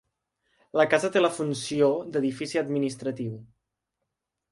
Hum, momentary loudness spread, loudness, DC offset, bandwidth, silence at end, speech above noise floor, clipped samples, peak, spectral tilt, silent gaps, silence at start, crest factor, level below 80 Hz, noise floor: none; 10 LU; -26 LUFS; under 0.1%; 11.5 kHz; 1.05 s; 58 dB; under 0.1%; -6 dBFS; -5 dB/octave; none; 0.75 s; 20 dB; -70 dBFS; -83 dBFS